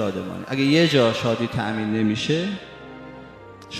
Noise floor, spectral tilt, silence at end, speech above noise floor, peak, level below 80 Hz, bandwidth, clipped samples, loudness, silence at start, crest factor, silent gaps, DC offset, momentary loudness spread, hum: -42 dBFS; -5.5 dB/octave; 0 s; 21 dB; -4 dBFS; -56 dBFS; 15 kHz; under 0.1%; -21 LUFS; 0 s; 18 dB; none; under 0.1%; 22 LU; none